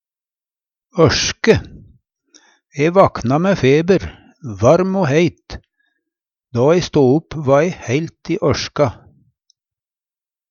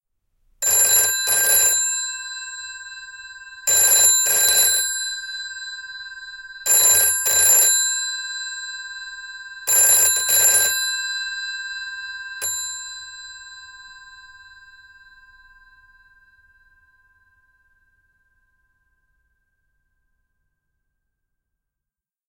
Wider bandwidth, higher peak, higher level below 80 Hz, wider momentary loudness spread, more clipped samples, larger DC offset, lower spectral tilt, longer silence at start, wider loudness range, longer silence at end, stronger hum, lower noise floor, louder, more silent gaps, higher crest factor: second, 7.2 kHz vs 17 kHz; about the same, 0 dBFS vs -2 dBFS; first, -42 dBFS vs -62 dBFS; second, 15 LU vs 22 LU; neither; neither; first, -5.5 dB/octave vs 3 dB/octave; first, 0.95 s vs 0.6 s; second, 3 LU vs 14 LU; second, 1.55 s vs 8.05 s; neither; about the same, under -90 dBFS vs -88 dBFS; about the same, -16 LUFS vs -16 LUFS; neither; about the same, 18 dB vs 20 dB